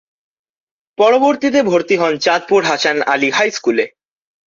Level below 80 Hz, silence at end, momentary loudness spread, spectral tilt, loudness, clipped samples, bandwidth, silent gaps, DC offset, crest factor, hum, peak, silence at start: -62 dBFS; 0.6 s; 5 LU; -3.5 dB/octave; -14 LUFS; under 0.1%; 7.6 kHz; none; under 0.1%; 14 dB; none; -2 dBFS; 1 s